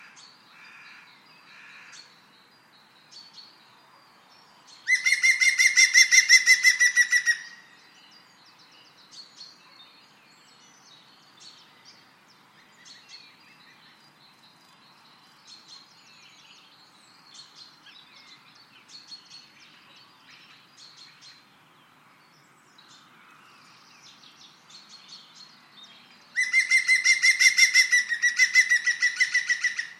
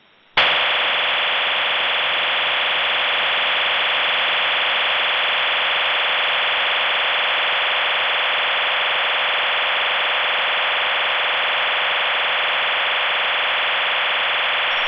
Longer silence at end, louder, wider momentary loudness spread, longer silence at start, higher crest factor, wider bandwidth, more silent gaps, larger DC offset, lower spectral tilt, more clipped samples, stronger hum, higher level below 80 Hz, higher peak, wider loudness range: about the same, 0.1 s vs 0 s; about the same, -19 LUFS vs -17 LUFS; first, 28 LU vs 1 LU; first, 1.95 s vs 0.35 s; first, 26 dB vs 14 dB; first, 14.5 kHz vs 5.4 kHz; neither; neither; second, 4.5 dB/octave vs -2 dB/octave; neither; neither; second, under -90 dBFS vs -62 dBFS; first, -2 dBFS vs -6 dBFS; first, 13 LU vs 1 LU